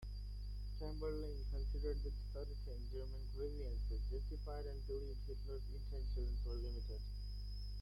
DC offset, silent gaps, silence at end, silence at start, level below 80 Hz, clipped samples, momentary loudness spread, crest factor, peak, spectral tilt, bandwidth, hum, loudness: under 0.1%; none; 0 s; 0 s; -44 dBFS; under 0.1%; 5 LU; 12 dB; -32 dBFS; -7.5 dB/octave; 12 kHz; 50 Hz at -45 dBFS; -47 LUFS